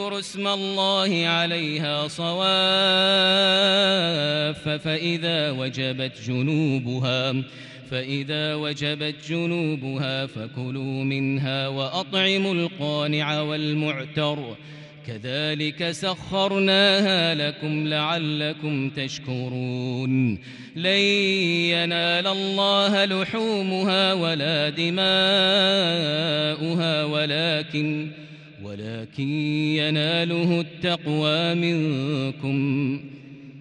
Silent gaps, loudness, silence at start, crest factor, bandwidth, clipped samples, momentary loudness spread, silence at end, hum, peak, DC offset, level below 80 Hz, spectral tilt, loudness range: none; -22 LUFS; 0 s; 16 dB; 11.5 kHz; under 0.1%; 12 LU; 0 s; none; -8 dBFS; under 0.1%; -64 dBFS; -5 dB/octave; 7 LU